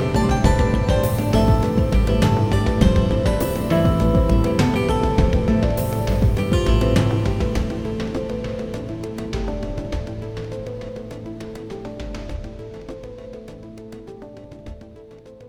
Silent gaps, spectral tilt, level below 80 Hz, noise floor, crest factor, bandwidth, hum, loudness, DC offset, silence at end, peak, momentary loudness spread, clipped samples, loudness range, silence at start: none; -7 dB/octave; -26 dBFS; -42 dBFS; 18 dB; 19.5 kHz; none; -20 LUFS; 0.3%; 0 s; 0 dBFS; 20 LU; under 0.1%; 16 LU; 0 s